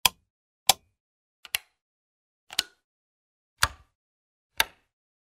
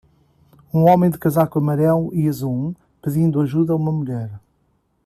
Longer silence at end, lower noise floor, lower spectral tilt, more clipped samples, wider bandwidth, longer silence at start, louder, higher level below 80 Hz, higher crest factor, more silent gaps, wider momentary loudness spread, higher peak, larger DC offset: about the same, 0.7 s vs 0.7 s; first, under -90 dBFS vs -64 dBFS; second, 0.5 dB/octave vs -9 dB/octave; neither; first, 16 kHz vs 14 kHz; second, 0.05 s vs 0.75 s; second, -28 LUFS vs -19 LUFS; about the same, -56 dBFS vs -54 dBFS; first, 32 dB vs 16 dB; first, 0.30-0.66 s, 1.00-1.43 s, 1.82-2.47 s, 2.84-3.57 s, 3.95-4.50 s vs none; second, 9 LU vs 12 LU; about the same, -2 dBFS vs -2 dBFS; neither